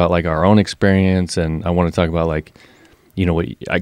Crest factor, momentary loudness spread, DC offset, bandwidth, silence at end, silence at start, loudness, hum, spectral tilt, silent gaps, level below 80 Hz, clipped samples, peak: 16 dB; 7 LU; under 0.1%; 11.5 kHz; 0 s; 0 s; -17 LUFS; none; -7 dB/octave; none; -34 dBFS; under 0.1%; 0 dBFS